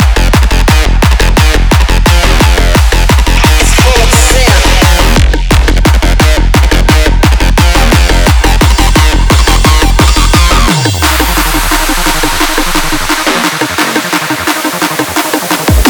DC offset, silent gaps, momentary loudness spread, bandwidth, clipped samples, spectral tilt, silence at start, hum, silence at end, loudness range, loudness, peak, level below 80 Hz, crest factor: under 0.1%; none; 4 LU; over 20 kHz; 1%; -4 dB/octave; 0 s; none; 0 s; 3 LU; -8 LUFS; 0 dBFS; -8 dBFS; 6 dB